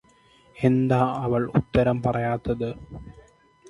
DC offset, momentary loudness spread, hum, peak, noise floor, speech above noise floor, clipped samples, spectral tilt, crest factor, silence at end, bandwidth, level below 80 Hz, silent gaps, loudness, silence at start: under 0.1%; 14 LU; none; -6 dBFS; -57 dBFS; 34 dB; under 0.1%; -9 dB/octave; 20 dB; 0.5 s; 11 kHz; -46 dBFS; none; -24 LUFS; 0.55 s